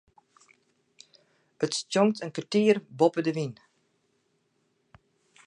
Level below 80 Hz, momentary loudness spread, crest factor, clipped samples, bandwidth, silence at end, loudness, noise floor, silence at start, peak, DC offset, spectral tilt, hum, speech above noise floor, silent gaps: -76 dBFS; 10 LU; 22 dB; under 0.1%; 10.5 kHz; 1.95 s; -27 LUFS; -73 dBFS; 1.6 s; -8 dBFS; under 0.1%; -5 dB/octave; none; 47 dB; none